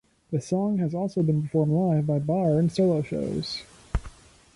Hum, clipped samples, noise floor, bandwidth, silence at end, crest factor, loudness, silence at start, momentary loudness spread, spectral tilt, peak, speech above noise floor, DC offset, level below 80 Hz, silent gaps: none; under 0.1%; -47 dBFS; 11.5 kHz; 0.45 s; 14 dB; -26 LUFS; 0.3 s; 12 LU; -8 dB/octave; -12 dBFS; 22 dB; under 0.1%; -44 dBFS; none